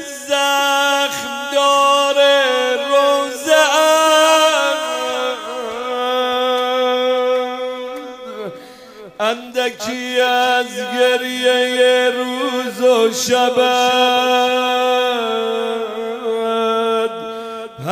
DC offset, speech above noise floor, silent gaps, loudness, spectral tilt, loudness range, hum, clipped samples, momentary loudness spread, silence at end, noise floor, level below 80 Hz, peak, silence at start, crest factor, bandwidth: under 0.1%; 23 dB; none; -15 LUFS; -1.5 dB/octave; 7 LU; none; under 0.1%; 12 LU; 0 s; -38 dBFS; -64 dBFS; 0 dBFS; 0 s; 16 dB; 16 kHz